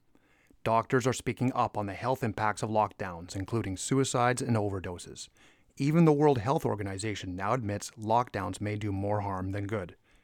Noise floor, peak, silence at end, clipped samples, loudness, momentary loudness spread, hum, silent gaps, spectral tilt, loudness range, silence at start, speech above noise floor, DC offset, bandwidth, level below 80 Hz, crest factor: -65 dBFS; -10 dBFS; 0.3 s; under 0.1%; -30 LUFS; 12 LU; none; none; -6 dB/octave; 3 LU; 0.65 s; 36 dB; under 0.1%; 17.5 kHz; -62 dBFS; 20 dB